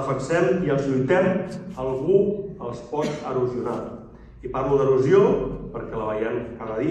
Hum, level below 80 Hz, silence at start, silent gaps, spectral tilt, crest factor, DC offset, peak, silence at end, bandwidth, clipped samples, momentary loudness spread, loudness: none; -46 dBFS; 0 s; none; -7.5 dB/octave; 18 dB; under 0.1%; -6 dBFS; 0 s; 9 kHz; under 0.1%; 14 LU; -23 LUFS